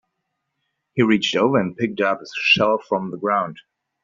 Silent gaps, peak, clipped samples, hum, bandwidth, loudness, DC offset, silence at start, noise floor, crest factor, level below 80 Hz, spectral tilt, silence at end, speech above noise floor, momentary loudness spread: none; -4 dBFS; under 0.1%; none; 7.6 kHz; -20 LUFS; under 0.1%; 0.95 s; -77 dBFS; 18 dB; -64 dBFS; -3 dB/octave; 0.45 s; 57 dB; 9 LU